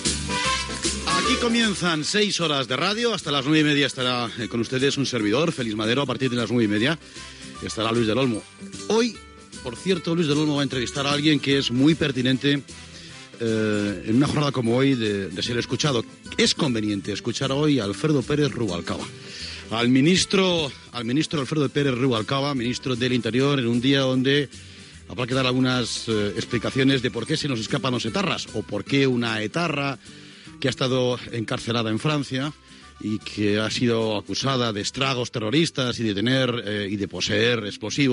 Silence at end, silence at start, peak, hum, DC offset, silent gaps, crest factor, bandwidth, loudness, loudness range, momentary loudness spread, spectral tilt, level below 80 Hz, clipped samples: 0 s; 0 s; -6 dBFS; none; under 0.1%; none; 18 dB; 11 kHz; -23 LUFS; 3 LU; 10 LU; -4.5 dB/octave; -50 dBFS; under 0.1%